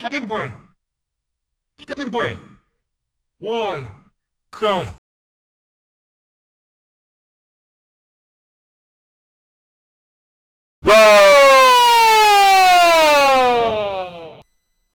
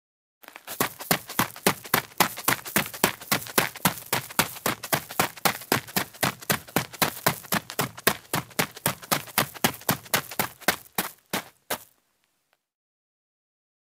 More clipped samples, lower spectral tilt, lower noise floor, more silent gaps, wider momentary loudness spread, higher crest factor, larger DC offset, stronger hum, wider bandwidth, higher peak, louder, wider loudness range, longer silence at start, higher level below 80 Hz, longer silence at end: neither; about the same, -2 dB/octave vs -2.5 dB/octave; first, -79 dBFS vs -73 dBFS; first, 4.98-10.82 s vs none; first, 21 LU vs 7 LU; second, 14 dB vs 28 dB; neither; neither; first, over 20 kHz vs 16.5 kHz; about the same, -2 dBFS vs -2 dBFS; first, -12 LUFS vs -26 LUFS; first, 19 LU vs 5 LU; second, 0 s vs 0.65 s; first, -50 dBFS vs -60 dBFS; second, 0.7 s vs 2 s